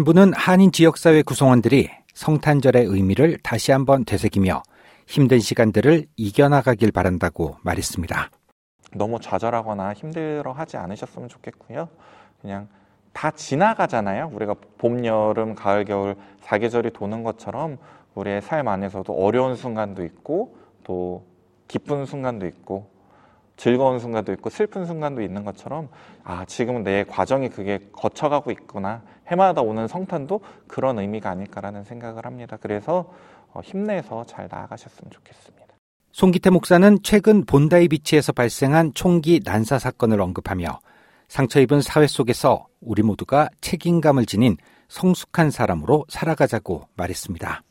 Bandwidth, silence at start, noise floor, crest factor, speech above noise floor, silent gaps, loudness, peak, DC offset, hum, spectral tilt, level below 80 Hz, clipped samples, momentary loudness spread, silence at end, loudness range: 16.5 kHz; 0 s; -55 dBFS; 20 dB; 35 dB; 8.52-8.79 s, 35.78-36.00 s; -20 LUFS; 0 dBFS; under 0.1%; none; -6.5 dB/octave; -50 dBFS; under 0.1%; 18 LU; 0.1 s; 12 LU